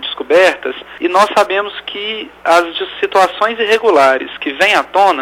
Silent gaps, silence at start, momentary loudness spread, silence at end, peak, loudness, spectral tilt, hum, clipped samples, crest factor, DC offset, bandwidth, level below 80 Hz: none; 0 s; 11 LU; 0 s; 0 dBFS; -13 LUFS; -2.5 dB/octave; none; under 0.1%; 12 dB; under 0.1%; 16.5 kHz; -54 dBFS